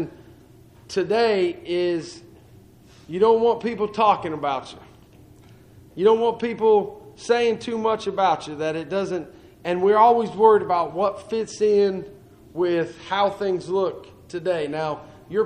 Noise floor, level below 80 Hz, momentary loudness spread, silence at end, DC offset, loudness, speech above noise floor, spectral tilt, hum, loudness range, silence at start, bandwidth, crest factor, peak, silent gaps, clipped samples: -50 dBFS; -58 dBFS; 16 LU; 0 s; under 0.1%; -22 LUFS; 28 dB; -5.5 dB/octave; none; 4 LU; 0 s; 10 kHz; 18 dB; -4 dBFS; none; under 0.1%